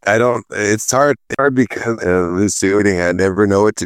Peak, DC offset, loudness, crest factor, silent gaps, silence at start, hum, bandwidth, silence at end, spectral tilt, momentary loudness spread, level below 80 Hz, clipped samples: -2 dBFS; under 0.1%; -15 LUFS; 14 dB; none; 0.05 s; none; 15.5 kHz; 0 s; -5 dB/octave; 4 LU; -48 dBFS; under 0.1%